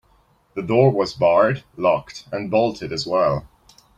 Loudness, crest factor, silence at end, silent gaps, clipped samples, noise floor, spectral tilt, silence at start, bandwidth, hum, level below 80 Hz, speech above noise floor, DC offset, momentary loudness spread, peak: -20 LUFS; 18 dB; 0.5 s; none; under 0.1%; -59 dBFS; -6.5 dB/octave; 0.55 s; 9.6 kHz; none; -52 dBFS; 39 dB; under 0.1%; 13 LU; -4 dBFS